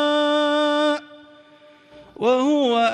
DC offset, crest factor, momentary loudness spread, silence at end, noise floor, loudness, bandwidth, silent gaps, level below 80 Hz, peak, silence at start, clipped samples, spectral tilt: under 0.1%; 14 dB; 5 LU; 0 s; -50 dBFS; -20 LUFS; 10.5 kHz; none; -70 dBFS; -8 dBFS; 0 s; under 0.1%; -3.5 dB/octave